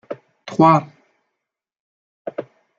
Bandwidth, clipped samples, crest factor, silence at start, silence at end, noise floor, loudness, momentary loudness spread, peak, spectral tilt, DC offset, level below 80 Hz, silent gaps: 7.4 kHz; under 0.1%; 20 dB; 0.1 s; 0.35 s; -82 dBFS; -16 LUFS; 21 LU; -2 dBFS; -8 dB/octave; under 0.1%; -64 dBFS; 1.80-2.25 s